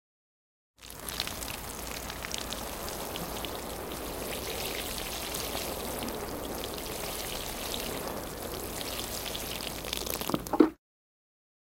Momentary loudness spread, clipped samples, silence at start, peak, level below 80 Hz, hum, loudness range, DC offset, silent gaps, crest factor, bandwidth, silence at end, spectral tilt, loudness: 5 LU; under 0.1%; 0.8 s; -4 dBFS; -48 dBFS; none; 4 LU; under 0.1%; none; 30 dB; 17 kHz; 1 s; -3 dB/octave; -34 LUFS